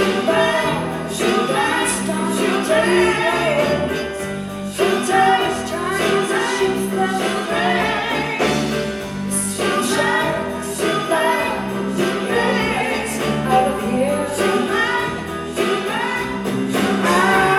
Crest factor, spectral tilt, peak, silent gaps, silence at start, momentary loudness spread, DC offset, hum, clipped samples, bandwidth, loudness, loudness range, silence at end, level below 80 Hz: 16 dB; -4 dB/octave; -2 dBFS; none; 0 s; 7 LU; under 0.1%; none; under 0.1%; 16 kHz; -19 LUFS; 2 LU; 0 s; -46 dBFS